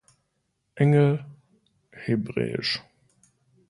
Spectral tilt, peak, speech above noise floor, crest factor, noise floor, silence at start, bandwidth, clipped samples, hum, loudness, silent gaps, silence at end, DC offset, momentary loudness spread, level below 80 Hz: -7.5 dB/octave; -8 dBFS; 53 dB; 18 dB; -75 dBFS; 0.75 s; 11 kHz; under 0.1%; none; -25 LUFS; none; 0.9 s; under 0.1%; 12 LU; -64 dBFS